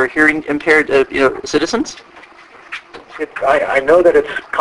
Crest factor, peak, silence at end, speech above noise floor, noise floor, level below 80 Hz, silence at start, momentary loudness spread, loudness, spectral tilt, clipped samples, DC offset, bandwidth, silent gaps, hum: 14 dB; 0 dBFS; 0 s; 26 dB; -40 dBFS; -46 dBFS; 0 s; 19 LU; -13 LUFS; -4 dB/octave; under 0.1%; under 0.1%; 11.5 kHz; none; none